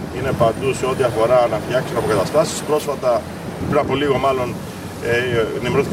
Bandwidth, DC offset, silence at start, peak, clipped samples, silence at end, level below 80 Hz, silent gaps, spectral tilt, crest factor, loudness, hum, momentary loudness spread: 16 kHz; under 0.1%; 0 s; -4 dBFS; under 0.1%; 0 s; -44 dBFS; none; -5.5 dB/octave; 16 dB; -19 LUFS; none; 8 LU